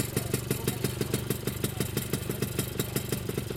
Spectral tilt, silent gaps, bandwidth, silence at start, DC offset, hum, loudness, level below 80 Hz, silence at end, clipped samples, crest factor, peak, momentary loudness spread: -4.5 dB/octave; none; 17 kHz; 0 s; under 0.1%; none; -31 LUFS; -48 dBFS; 0 s; under 0.1%; 18 dB; -12 dBFS; 2 LU